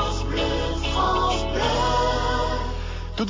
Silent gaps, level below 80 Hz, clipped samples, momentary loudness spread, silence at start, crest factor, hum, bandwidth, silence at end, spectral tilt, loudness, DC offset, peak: none; -28 dBFS; under 0.1%; 8 LU; 0 s; 14 dB; none; 7.6 kHz; 0 s; -5 dB/octave; -24 LUFS; under 0.1%; -10 dBFS